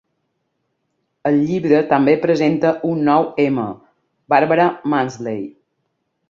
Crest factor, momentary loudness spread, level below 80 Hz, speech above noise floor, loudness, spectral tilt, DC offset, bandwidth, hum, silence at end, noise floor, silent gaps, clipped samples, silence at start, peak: 16 dB; 11 LU; -62 dBFS; 55 dB; -17 LUFS; -7.5 dB/octave; under 0.1%; 7.4 kHz; none; 0.8 s; -71 dBFS; none; under 0.1%; 1.25 s; -2 dBFS